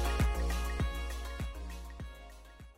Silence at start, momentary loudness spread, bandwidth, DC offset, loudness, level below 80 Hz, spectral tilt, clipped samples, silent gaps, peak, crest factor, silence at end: 0 s; 18 LU; 16 kHz; under 0.1%; -37 LUFS; -36 dBFS; -5 dB/octave; under 0.1%; none; -22 dBFS; 14 dB; 0.05 s